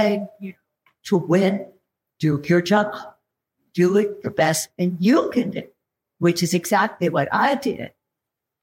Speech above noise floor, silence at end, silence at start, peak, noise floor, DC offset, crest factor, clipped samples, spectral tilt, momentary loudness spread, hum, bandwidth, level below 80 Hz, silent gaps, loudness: 64 dB; 0.75 s; 0 s; -6 dBFS; -84 dBFS; under 0.1%; 14 dB; under 0.1%; -5.5 dB/octave; 16 LU; none; 16.5 kHz; -64 dBFS; none; -21 LUFS